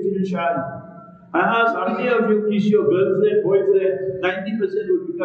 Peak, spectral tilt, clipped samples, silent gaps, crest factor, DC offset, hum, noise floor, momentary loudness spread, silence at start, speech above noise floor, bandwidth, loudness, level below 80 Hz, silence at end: -6 dBFS; -8 dB/octave; under 0.1%; none; 14 dB; under 0.1%; none; -41 dBFS; 6 LU; 0 s; 22 dB; 6.8 kHz; -19 LUFS; -64 dBFS; 0 s